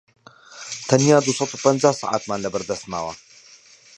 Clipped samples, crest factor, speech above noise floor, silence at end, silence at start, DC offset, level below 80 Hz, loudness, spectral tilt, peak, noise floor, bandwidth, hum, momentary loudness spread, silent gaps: under 0.1%; 22 dB; 29 dB; 0.8 s; 0.5 s; under 0.1%; -60 dBFS; -20 LUFS; -4.5 dB/octave; 0 dBFS; -49 dBFS; 11.5 kHz; none; 17 LU; none